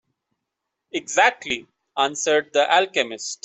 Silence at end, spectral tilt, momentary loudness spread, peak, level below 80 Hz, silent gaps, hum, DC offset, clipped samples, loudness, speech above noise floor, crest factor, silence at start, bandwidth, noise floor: 0.1 s; -1 dB/octave; 12 LU; -4 dBFS; -68 dBFS; none; none; under 0.1%; under 0.1%; -21 LUFS; 60 dB; 18 dB; 0.95 s; 8.4 kHz; -81 dBFS